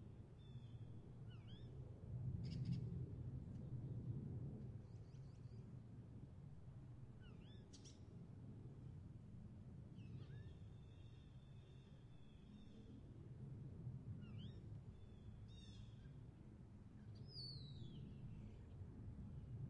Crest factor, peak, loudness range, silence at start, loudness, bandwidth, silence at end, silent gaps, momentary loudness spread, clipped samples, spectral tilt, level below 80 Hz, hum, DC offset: 20 dB; -36 dBFS; 9 LU; 0 s; -56 LUFS; 9.4 kHz; 0 s; none; 11 LU; under 0.1%; -7.5 dB/octave; -66 dBFS; none; under 0.1%